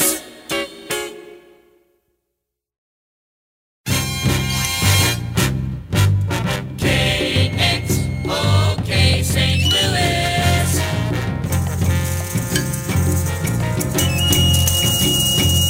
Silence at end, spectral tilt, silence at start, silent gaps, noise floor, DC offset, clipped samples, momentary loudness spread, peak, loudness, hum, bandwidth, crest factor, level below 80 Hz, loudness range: 0 s; -4 dB/octave; 0 s; 2.78-3.84 s; -79 dBFS; under 0.1%; under 0.1%; 8 LU; -2 dBFS; -17 LUFS; none; 17 kHz; 16 dB; -32 dBFS; 10 LU